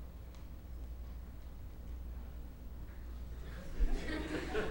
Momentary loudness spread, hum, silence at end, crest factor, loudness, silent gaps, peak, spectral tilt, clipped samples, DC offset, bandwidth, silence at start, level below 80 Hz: 12 LU; 60 Hz at -50 dBFS; 0 s; 20 dB; -46 LUFS; none; -22 dBFS; -6 dB/octave; under 0.1%; under 0.1%; 16 kHz; 0 s; -42 dBFS